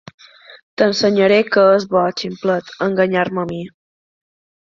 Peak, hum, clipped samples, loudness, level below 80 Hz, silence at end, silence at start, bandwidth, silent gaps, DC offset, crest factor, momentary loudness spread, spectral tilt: -2 dBFS; none; under 0.1%; -16 LUFS; -60 dBFS; 1 s; 0.5 s; 7.6 kHz; 0.63-0.77 s; under 0.1%; 16 dB; 13 LU; -5.5 dB/octave